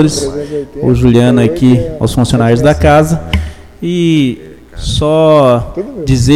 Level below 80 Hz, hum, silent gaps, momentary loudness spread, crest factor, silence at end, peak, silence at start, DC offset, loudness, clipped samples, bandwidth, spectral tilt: -24 dBFS; none; none; 12 LU; 10 dB; 0 s; 0 dBFS; 0 s; under 0.1%; -10 LUFS; 0.2%; 14.5 kHz; -6.5 dB/octave